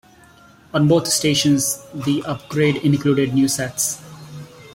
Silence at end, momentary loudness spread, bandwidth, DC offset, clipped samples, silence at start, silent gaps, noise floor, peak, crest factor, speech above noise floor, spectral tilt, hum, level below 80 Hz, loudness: 0.05 s; 16 LU; 16.5 kHz; under 0.1%; under 0.1%; 0.75 s; none; -48 dBFS; -4 dBFS; 16 dB; 30 dB; -4.5 dB/octave; none; -54 dBFS; -18 LUFS